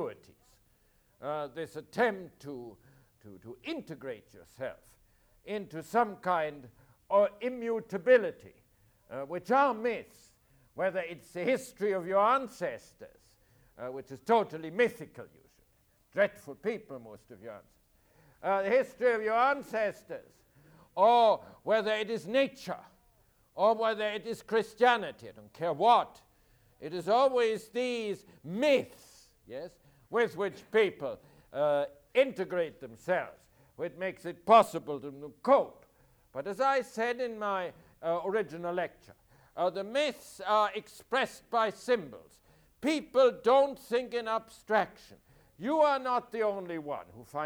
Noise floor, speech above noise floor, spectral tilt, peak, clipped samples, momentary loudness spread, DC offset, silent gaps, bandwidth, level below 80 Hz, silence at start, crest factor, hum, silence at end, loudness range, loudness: -69 dBFS; 38 dB; -5 dB/octave; -10 dBFS; under 0.1%; 19 LU; under 0.1%; none; over 20 kHz; -70 dBFS; 0 s; 22 dB; none; 0 s; 7 LU; -30 LUFS